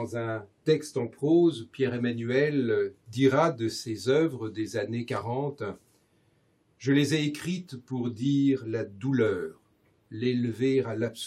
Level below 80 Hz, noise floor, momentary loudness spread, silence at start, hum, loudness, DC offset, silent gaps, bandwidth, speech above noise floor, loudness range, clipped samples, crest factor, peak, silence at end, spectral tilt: -74 dBFS; -67 dBFS; 10 LU; 0 s; none; -28 LUFS; under 0.1%; none; 14 kHz; 40 dB; 5 LU; under 0.1%; 18 dB; -10 dBFS; 0 s; -6.5 dB/octave